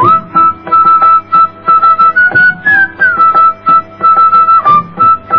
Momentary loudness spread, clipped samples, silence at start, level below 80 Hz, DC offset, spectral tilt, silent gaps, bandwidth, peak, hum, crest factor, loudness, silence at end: 4 LU; under 0.1%; 0 s; -48 dBFS; 1%; -7 dB/octave; none; 5.4 kHz; 0 dBFS; 50 Hz at -40 dBFS; 8 dB; -6 LUFS; 0 s